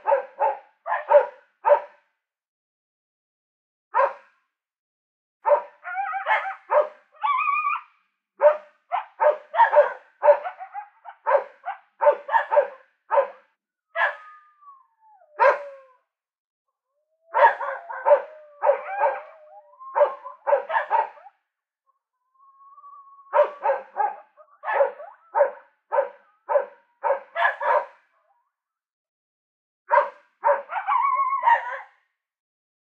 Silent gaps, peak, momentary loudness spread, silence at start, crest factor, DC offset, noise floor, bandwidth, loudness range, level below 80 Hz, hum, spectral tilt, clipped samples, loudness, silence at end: 2.48-3.91 s, 4.79-5.40 s, 16.38-16.65 s, 28.93-29.85 s; -4 dBFS; 14 LU; 0.05 s; 22 dB; under 0.1%; -81 dBFS; 4.6 kHz; 6 LU; under -90 dBFS; none; -2 dB/octave; under 0.1%; -23 LUFS; 1 s